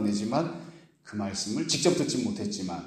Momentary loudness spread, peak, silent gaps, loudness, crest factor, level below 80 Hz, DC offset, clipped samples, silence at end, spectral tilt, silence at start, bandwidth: 14 LU; -10 dBFS; none; -29 LUFS; 20 dB; -64 dBFS; under 0.1%; under 0.1%; 0 s; -4 dB/octave; 0 s; 14 kHz